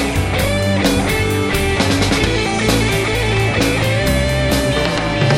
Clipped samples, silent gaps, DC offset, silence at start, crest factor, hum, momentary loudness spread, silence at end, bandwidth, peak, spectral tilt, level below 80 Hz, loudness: under 0.1%; none; 0.3%; 0 s; 14 dB; none; 2 LU; 0 s; 16.5 kHz; 0 dBFS; -5 dB/octave; -26 dBFS; -16 LUFS